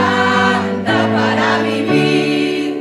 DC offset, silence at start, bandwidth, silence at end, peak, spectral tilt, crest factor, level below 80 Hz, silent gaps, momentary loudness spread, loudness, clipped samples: under 0.1%; 0 s; 13 kHz; 0 s; -2 dBFS; -5.5 dB/octave; 12 dB; -58 dBFS; none; 4 LU; -14 LUFS; under 0.1%